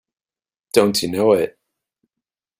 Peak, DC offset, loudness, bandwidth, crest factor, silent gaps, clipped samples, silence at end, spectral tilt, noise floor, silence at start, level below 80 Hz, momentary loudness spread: -2 dBFS; under 0.1%; -18 LUFS; 16 kHz; 20 dB; none; under 0.1%; 1.1 s; -4.5 dB/octave; under -90 dBFS; 0.75 s; -60 dBFS; 3 LU